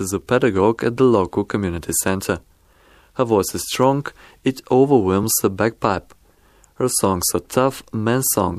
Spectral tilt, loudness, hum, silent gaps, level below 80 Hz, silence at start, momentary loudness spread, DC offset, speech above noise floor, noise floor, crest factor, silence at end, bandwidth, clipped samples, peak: -4.5 dB/octave; -19 LUFS; none; none; -48 dBFS; 0 s; 9 LU; under 0.1%; 35 dB; -54 dBFS; 18 dB; 0 s; 15.5 kHz; under 0.1%; -2 dBFS